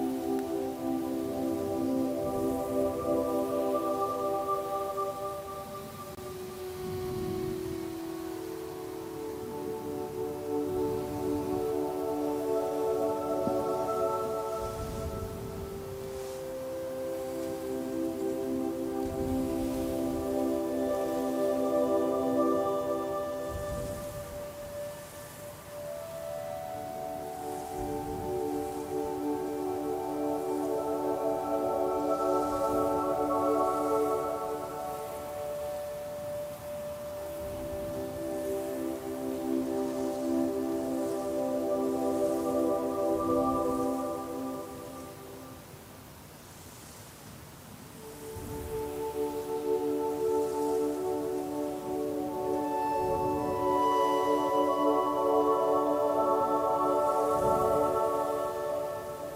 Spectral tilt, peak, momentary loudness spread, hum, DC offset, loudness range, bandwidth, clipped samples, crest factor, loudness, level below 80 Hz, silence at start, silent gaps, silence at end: -6 dB/octave; -14 dBFS; 12 LU; none; under 0.1%; 10 LU; 16 kHz; under 0.1%; 16 dB; -32 LUFS; -54 dBFS; 0 s; none; 0 s